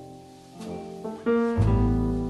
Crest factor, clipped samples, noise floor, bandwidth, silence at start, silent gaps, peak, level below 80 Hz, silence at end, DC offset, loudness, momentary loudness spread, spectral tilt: 14 dB; under 0.1%; -46 dBFS; 11 kHz; 0 s; none; -12 dBFS; -34 dBFS; 0 s; under 0.1%; -25 LUFS; 20 LU; -9 dB/octave